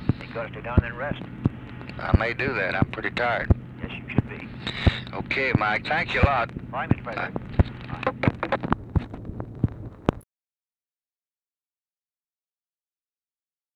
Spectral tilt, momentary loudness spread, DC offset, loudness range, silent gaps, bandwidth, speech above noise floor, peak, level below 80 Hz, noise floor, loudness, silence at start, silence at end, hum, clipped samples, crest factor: -8 dB/octave; 11 LU; under 0.1%; 10 LU; none; 8.4 kHz; over 65 dB; -2 dBFS; -36 dBFS; under -90 dBFS; -26 LUFS; 0 s; 3.55 s; none; under 0.1%; 26 dB